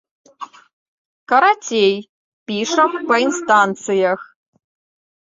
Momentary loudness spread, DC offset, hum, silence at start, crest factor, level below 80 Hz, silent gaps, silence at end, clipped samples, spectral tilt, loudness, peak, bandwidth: 22 LU; under 0.1%; none; 0.4 s; 18 dB; -68 dBFS; 0.73-1.26 s, 2.09-2.46 s; 1 s; under 0.1%; -3.5 dB/octave; -16 LUFS; -2 dBFS; 7.8 kHz